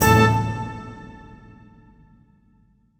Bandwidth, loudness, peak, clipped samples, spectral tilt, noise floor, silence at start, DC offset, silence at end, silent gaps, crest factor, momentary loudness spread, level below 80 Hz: over 20 kHz; -20 LUFS; -2 dBFS; under 0.1%; -5.5 dB/octave; -59 dBFS; 0 s; under 0.1%; 1.85 s; none; 22 dB; 26 LU; -42 dBFS